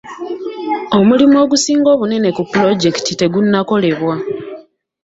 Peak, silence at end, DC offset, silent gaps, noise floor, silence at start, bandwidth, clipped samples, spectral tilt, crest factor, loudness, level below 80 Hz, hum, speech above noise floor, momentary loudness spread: 0 dBFS; 0.45 s; under 0.1%; none; -36 dBFS; 0.05 s; 8 kHz; under 0.1%; -5 dB/octave; 14 dB; -13 LUFS; -54 dBFS; none; 24 dB; 14 LU